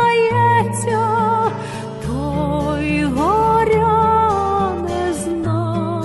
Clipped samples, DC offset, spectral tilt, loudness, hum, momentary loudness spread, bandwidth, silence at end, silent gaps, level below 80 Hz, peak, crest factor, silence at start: under 0.1%; under 0.1%; -6.5 dB/octave; -17 LUFS; none; 7 LU; 12 kHz; 0 s; none; -36 dBFS; -4 dBFS; 12 dB; 0 s